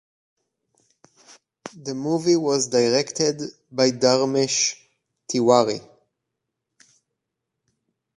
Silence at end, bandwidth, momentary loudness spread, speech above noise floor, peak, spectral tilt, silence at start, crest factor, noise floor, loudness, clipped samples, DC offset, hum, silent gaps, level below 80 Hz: 2.35 s; 11.5 kHz; 15 LU; 61 dB; -2 dBFS; -3.5 dB/octave; 1.65 s; 22 dB; -82 dBFS; -21 LUFS; under 0.1%; under 0.1%; none; none; -70 dBFS